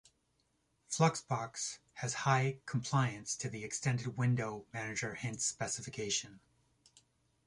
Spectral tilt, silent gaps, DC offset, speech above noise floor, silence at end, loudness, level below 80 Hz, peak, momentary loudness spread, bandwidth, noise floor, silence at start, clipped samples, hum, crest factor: -4 dB/octave; none; under 0.1%; 42 dB; 1.1 s; -36 LUFS; -70 dBFS; -16 dBFS; 9 LU; 11.5 kHz; -78 dBFS; 0.9 s; under 0.1%; none; 20 dB